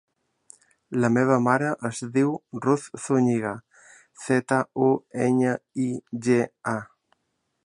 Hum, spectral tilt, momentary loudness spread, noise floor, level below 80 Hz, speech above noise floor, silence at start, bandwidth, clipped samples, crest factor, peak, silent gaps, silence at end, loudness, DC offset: none; -6.5 dB/octave; 10 LU; -76 dBFS; -68 dBFS; 52 dB; 0.9 s; 11 kHz; under 0.1%; 20 dB; -6 dBFS; none; 0.8 s; -24 LUFS; under 0.1%